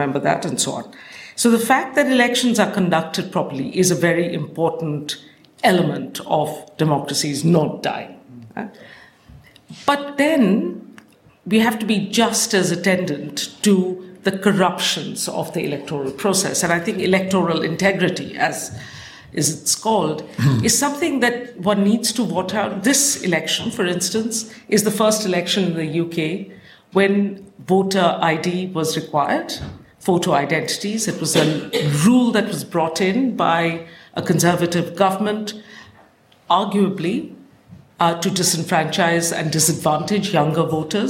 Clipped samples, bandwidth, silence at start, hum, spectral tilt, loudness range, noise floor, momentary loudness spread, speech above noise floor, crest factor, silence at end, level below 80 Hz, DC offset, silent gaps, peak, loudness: under 0.1%; 16.5 kHz; 0 s; none; -4 dB/octave; 3 LU; -52 dBFS; 10 LU; 33 dB; 18 dB; 0 s; -58 dBFS; under 0.1%; none; -2 dBFS; -19 LUFS